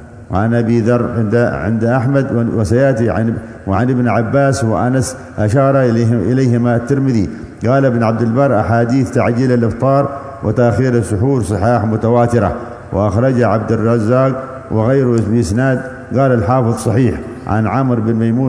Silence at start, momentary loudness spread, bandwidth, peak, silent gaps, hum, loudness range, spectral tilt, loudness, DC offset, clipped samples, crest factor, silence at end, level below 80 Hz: 0 s; 6 LU; 11 kHz; 0 dBFS; none; none; 1 LU; -8 dB/octave; -14 LUFS; under 0.1%; under 0.1%; 14 dB; 0 s; -38 dBFS